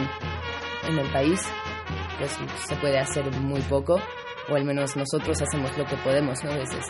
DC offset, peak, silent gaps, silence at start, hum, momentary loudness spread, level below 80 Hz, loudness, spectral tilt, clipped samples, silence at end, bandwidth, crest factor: under 0.1%; -10 dBFS; none; 0 s; none; 8 LU; -46 dBFS; -27 LUFS; -5 dB/octave; under 0.1%; 0 s; 11.5 kHz; 16 dB